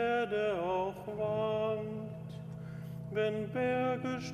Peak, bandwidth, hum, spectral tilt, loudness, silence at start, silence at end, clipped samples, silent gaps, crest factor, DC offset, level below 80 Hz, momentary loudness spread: -22 dBFS; 14 kHz; none; -7 dB/octave; -35 LUFS; 0 s; 0 s; under 0.1%; none; 14 dB; under 0.1%; -64 dBFS; 12 LU